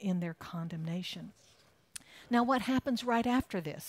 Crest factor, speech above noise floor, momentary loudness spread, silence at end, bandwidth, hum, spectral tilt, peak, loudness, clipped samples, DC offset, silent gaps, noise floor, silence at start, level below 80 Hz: 16 dB; 20 dB; 19 LU; 0 s; 16 kHz; none; -5.5 dB/octave; -18 dBFS; -33 LUFS; under 0.1%; under 0.1%; none; -53 dBFS; 0 s; -62 dBFS